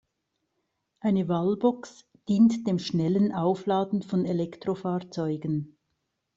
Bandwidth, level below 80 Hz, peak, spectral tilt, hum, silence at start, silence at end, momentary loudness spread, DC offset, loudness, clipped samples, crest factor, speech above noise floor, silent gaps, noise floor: 7.8 kHz; -66 dBFS; -10 dBFS; -8 dB/octave; none; 1.05 s; 0.7 s; 10 LU; under 0.1%; -27 LUFS; under 0.1%; 18 dB; 54 dB; none; -79 dBFS